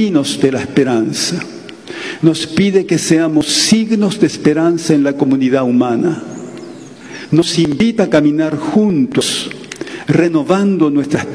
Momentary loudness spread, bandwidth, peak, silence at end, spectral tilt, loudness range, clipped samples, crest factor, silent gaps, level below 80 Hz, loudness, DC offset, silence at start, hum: 15 LU; 11 kHz; 0 dBFS; 0 s; -5 dB/octave; 2 LU; 0.1%; 14 dB; none; -52 dBFS; -13 LUFS; 0.2%; 0 s; none